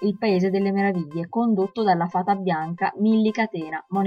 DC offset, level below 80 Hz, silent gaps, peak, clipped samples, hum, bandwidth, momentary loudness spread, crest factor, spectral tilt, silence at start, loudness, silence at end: under 0.1%; -68 dBFS; none; -8 dBFS; under 0.1%; none; 6.6 kHz; 6 LU; 14 dB; -8 dB/octave; 0 s; -23 LUFS; 0 s